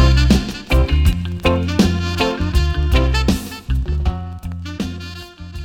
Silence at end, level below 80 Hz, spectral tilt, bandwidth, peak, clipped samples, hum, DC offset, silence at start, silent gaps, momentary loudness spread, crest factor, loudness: 0 s; -20 dBFS; -6 dB/octave; 16 kHz; -2 dBFS; under 0.1%; none; under 0.1%; 0 s; none; 13 LU; 14 dB; -18 LUFS